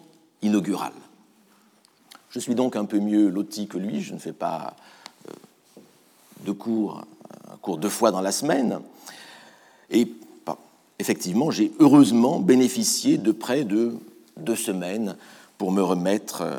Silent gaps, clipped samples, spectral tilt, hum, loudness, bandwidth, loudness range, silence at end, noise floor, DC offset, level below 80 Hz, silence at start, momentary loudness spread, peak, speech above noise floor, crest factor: none; under 0.1%; -5 dB/octave; none; -23 LUFS; 19.5 kHz; 13 LU; 0 s; -59 dBFS; under 0.1%; -84 dBFS; 0.4 s; 19 LU; -4 dBFS; 37 dB; 20 dB